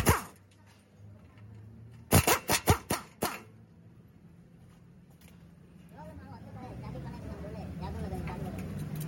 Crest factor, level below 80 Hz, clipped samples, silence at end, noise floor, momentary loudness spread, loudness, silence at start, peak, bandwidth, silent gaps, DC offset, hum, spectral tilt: 26 dB; -48 dBFS; under 0.1%; 0 s; -59 dBFS; 27 LU; -32 LUFS; 0 s; -10 dBFS; 17 kHz; none; under 0.1%; none; -4 dB/octave